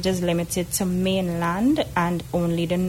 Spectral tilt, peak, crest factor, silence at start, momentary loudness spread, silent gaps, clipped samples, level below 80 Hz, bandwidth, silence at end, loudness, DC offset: -5.5 dB/octave; -8 dBFS; 14 dB; 0 s; 3 LU; none; under 0.1%; -44 dBFS; 16.5 kHz; 0 s; -23 LUFS; under 0.1%